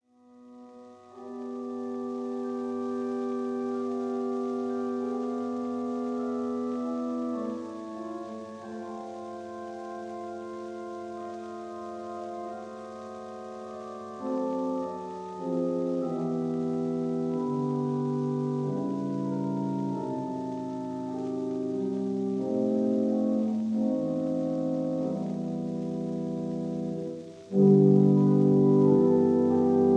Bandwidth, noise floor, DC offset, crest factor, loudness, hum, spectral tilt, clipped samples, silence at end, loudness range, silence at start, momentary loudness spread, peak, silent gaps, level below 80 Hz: 9 kHz; -55 dBFS; under 0.1%; 20 dB; -29 LUFS; none; -9.5 dB/octave; under 0.1%; 0 s; 14 LU; 0.35 s; 17 LU; -10 dBFS; none; -74 dBFS